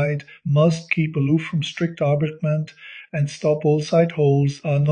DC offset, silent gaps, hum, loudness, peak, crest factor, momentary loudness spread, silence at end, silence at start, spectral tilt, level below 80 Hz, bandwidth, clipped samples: under 0.1%; none; none; -21 LUFS; -4 dBFS; 16 dB; 8 LU; 0 s; 0 s; -7.5 dB/octave; -60 dBFS; 9.4 kHz; under 0.1%